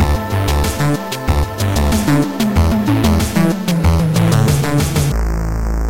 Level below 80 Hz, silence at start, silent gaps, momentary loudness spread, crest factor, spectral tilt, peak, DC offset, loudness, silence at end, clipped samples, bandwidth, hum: -20 dBFS; 0 s; none; 5 LU; 12 dB; -6 dB/octave; -4 dBFS; 2%; -15 LUFS; 0 s; under 0.1%; 17 kHz; none